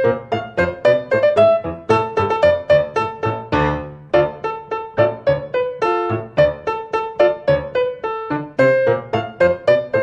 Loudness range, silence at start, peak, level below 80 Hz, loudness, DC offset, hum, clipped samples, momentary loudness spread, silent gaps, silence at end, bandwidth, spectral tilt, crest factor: 3 LU; 0 s; -2 dBFS; -42 dBFS; -18 LUFS; under 0.1%; none; under 0.1%; 9 LU; none; 0 s; 8.2 kHz; -7 dB/octave; 16 dB